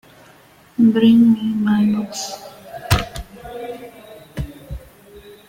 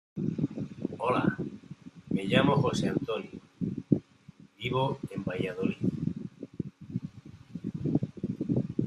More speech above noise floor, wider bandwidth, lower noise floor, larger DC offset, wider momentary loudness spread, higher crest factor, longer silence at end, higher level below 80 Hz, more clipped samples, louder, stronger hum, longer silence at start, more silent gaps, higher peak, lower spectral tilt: first, 34 dB vs 26 dB; first, 17 kHz vs 11.5 kHz; second, -48 dBFS vs -55 dBFS; neither; first, 24 LU vs 14 LU; second, 18 dB vs 24 dB; first, 0.15 s vs 0 s; first, -38 dBFS vs -62 dBFS; neither; first, -16 LUFS vs -32 LUFS; neither; first, 0.8 s vs 0.15 s; neither; first, 0 dBFS vs -8 dBFS; about the same, -6 dB/octave vs -7 dB/octave